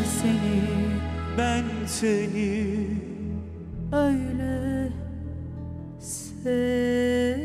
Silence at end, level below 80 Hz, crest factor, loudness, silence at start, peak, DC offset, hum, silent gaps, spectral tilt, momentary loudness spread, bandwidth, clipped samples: 0 s; -40 dBFS; 14 dB; -27 LUFS; 0 s; -12 dBFS; under 0.1%; none; none; -5.5 dB/octave; 12 LU; 15 kHz; under 0.1%